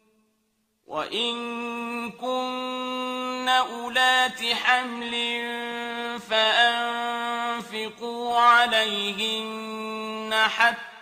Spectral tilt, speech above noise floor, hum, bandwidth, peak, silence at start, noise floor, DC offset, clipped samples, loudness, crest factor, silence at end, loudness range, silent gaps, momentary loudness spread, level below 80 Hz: -1.5 dB/octave; 46 dB; none; 15.5 kHz; -6 dBFS; 0.9 s; -72 dBFS; under 0.1%; under 0.1%; -24 LUFS; 20 dB; 0 s; 5 LU; none; 13 LU; -70 dBFS